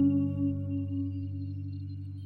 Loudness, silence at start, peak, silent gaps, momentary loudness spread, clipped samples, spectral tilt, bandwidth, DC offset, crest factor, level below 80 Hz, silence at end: -33 LUFS; 0 s; -16 dBFS; none; 10 LU; under 0.1%; -12 dB/octave; 4.5 kHz; under 0.1%; 14 dB; -62 dBFS; 0 s